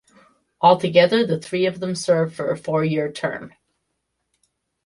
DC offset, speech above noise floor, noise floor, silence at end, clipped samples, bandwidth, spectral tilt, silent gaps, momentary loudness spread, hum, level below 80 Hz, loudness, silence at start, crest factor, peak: under 0.1%; 56 dB; -75 dBFS; 1.4 s; under 0.1%; 11.5 kHz; -5.5 dB/octave; none; 10 LU; none; -64 dBFS; -20 LUFS; 0.6 s; 20 dB; -2 dBFS